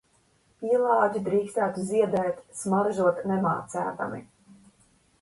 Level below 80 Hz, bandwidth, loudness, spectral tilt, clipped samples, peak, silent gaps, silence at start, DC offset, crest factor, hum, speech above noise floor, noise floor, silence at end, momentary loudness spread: -66 dBFS; 11.5 kHz; -26 LUFS; -6.5 dB/octave; under 0.1%; -8 dBFS; none; 0.6 s; under 0.1%; 18 dB; none; 40 dB; -65 dBFS; 0.95 s; 11 LU